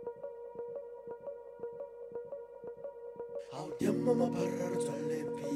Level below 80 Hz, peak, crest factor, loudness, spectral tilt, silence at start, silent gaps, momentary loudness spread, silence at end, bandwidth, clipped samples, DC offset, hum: -74 dBFS; -18 dBFS; 20 dB; -38 LUFS; -6.5 dB/octave; 0 s; none; 15 LU; 0 s; 15 kHz; under 0.1%; under 0.1%; none